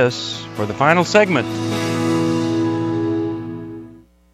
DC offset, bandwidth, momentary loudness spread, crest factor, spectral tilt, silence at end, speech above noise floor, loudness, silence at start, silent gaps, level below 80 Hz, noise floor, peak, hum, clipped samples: under 0.1%; 14 kHz; 14 LU; 18 dB; -5.5 dB/octave; 0.35 s; 26 dB; -18 LUFS; 0 s; none; -54 dBFS; -43 dBFS; 0 dBFS; none; under 0.1%